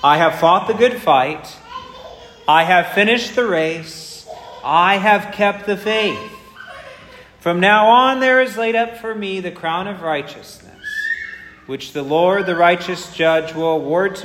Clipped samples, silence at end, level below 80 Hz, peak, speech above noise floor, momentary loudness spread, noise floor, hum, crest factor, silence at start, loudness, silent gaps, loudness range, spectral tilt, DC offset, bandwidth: under 0.1%; 0 s; -56 dBFS; 0 dBFS; 26 dB; 21 LU; -41 dBFS; none; 16 dB; 0 s; -16 LUFS; none; 6 LU; -4.5 dB/octave; under 0.1%; 16 kHz